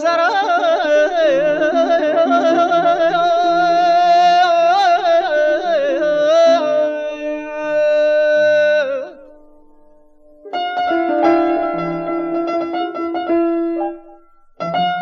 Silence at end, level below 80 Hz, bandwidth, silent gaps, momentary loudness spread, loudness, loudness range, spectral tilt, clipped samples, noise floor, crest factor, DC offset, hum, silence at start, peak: 0 s; -54 dBFS; 7.2 kHz; none; 10 LU; -15 LUFS; 6 LU; -4.5 dB/octave; under 0.1%; -46 dBFS; 12 dB; under 0.1%; none; 0 s; -2 dBFS